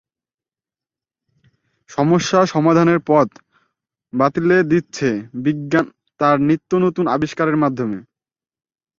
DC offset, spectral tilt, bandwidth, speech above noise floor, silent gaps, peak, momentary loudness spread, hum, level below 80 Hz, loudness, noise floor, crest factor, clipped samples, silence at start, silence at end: under 0.1%; -6.5 dB/octave; 7.6 kHz; over 74 dB; none; -2 dBFS; 9 LU; none; -58 dBFS; -17 LUFS; under -90 dBFS; 16 dB; under 0.1%; 1.9 s; 1 s